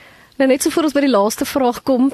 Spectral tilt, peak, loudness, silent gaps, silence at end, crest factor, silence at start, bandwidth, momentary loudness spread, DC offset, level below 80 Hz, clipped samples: -3.5 dB/octave; -4 dBFS; -16 LUFS; none; 0 s; 14 dB; 0.4 s; 13 kHz; 3 LU; under 0.1%; -52 dBFS; under 0.1%